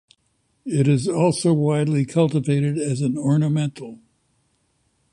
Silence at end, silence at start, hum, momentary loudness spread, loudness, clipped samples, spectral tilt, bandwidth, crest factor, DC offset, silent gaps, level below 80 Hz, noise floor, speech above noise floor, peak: 1.2 s; 0.65 s; none; 8 LU; -20 LUFS; under 0.1%; -7 dB/octave; 11.5 kHz; 16 dB; under 0.1%; none; -58 dBFS; -68 dBFS; 48 dB; -6 dBFS